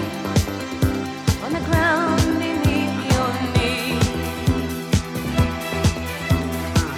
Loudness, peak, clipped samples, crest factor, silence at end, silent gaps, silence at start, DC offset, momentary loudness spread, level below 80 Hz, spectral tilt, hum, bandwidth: -21 LUFS; -4 dBFS; under 0.1%; 16 dB; 0 s; none; 0 s; under 0.1%; 5 LU; -32 dBFS; -5.5 dB/octave; none; 17 kHz